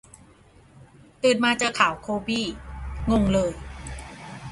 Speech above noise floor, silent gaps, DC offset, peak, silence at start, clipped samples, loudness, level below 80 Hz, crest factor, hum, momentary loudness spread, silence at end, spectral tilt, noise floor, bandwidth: 31 dB; none; under 0.1%; -4 dBFS; 0.75 s; under 0.1%; -23 LUFS; -40 dBFS; 22 dB; none; 17 LU; 0 s; -4.5 dB/octave; -53 dBFS; 11.5 kHz